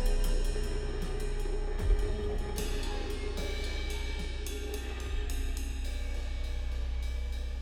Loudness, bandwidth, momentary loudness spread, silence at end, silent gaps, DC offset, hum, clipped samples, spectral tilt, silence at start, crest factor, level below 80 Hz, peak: -37 LUFS; 15.5 kHz; 5 LU; 0 s; none; under 0.1%; none; under 0.1%; -5 dB/octave; 0 s; 14 dB; -32 dBFS; -16 dBFS